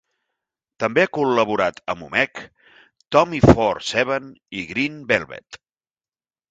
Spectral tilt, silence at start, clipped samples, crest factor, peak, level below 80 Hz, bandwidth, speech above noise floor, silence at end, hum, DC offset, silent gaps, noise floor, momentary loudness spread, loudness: -6 dB/octave; 0.8 s; under 0.1%; 22 dB; 0 dBFS; -42 dBFS; 9.2 kHz; over 70 dB; 0.95 s; none; under 0.1%; none; under -90 dBFS; 16 LU; -20 LUFS